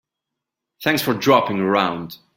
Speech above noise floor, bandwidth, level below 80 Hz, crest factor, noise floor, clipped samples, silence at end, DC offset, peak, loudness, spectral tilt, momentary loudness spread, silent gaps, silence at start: 64 dB; 17 kHz; -62 dBFS; 18 dB; -83 dBFS; under 0.1%; 0.2 s; under 0.1%; -2 dBFS; -19 LUFS; -5 dB/octave; 8 LU; none; 0.8 s